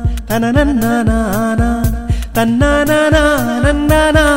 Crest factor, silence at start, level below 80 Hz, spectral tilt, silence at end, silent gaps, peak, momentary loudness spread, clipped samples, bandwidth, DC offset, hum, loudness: 12 dB; 0 s; -20 dBFS; -5.5 dB/octave; 0 s; none; 0 dBFS; 7 LU; under 0.1%; 16.5 kHz; 0.1%; none; -13 LUFS